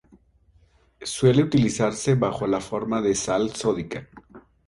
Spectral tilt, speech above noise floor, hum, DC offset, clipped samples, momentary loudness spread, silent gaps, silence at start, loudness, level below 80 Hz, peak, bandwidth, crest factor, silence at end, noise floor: -5.5 dB/octave; 37 dB; none; under 0.1%; under 0.1%; 12 LU; none; 1 s; -23 LUFS; -52 dBFS; -6 dBFS; 11.5 kHz; 18 dB; 0.3 s; -59 dBFS